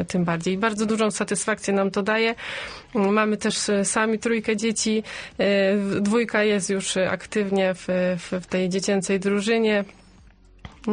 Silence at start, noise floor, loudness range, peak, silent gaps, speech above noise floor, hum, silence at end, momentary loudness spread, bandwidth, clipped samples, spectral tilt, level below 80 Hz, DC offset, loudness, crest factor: 0 s; -51 dBFS; 1 LU; -8 dBFS; none; 28 dB; none; 0 s; 5 LU; 10 kHz; under 0.1%; -4.5 dB/octave; -56 dBFS; under 0.1%; -23 LUFS; 16 dB